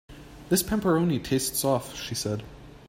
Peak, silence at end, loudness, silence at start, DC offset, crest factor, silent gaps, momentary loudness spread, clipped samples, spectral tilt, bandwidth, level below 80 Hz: -10 dBFS; 0 s; -26 LUFS; 0.1 s; under 0.1%; 16 dB; none; 11 LU; under 0.1%; -4.5 dB/octave; 16 kHz; -50 dBFS